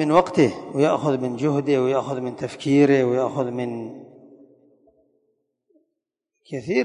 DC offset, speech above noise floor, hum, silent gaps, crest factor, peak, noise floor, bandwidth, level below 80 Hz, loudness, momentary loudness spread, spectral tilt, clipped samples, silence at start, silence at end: under 0.1%; 60 dB; none; none; 18 dB; -4 dBFS; -81 dBFS; 10.5 kHz; -64 dBFS; -21 LUFS; 15 LU; -7 dB/octave; under 0.1%; 0 s; 0 s